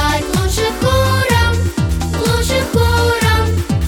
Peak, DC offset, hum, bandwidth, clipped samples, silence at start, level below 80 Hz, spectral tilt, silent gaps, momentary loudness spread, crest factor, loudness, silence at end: 0 dBFS; under 0.1%; none; 18 kHz; under 0.1%; 0 s; -22 dBFS; -5 dB/octave; none; 4 LU; 14 dB; -15 LUFS; 0 s